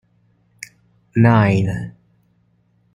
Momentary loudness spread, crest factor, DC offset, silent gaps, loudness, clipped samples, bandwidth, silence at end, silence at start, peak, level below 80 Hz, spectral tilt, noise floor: 25 LU; 18 dB; under 0.1%; none; -17 LUFS; under 0.1%; 10.5 kHz; 1.05 s; 1.15 s; -2 dBFS; -48 dBFS; -8 dB/octave; -60 dBFS